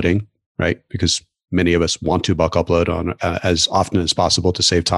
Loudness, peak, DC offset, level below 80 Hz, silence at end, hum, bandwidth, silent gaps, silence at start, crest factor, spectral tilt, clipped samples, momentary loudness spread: -18 LUFS; -4 dBFS; under 0.1%; -36 dBFS; 0 s; none; 12 kHz; 0.46-0.55 s; 0 s; 14 dB; -4 dB/octave; under 0.1%; 6 LU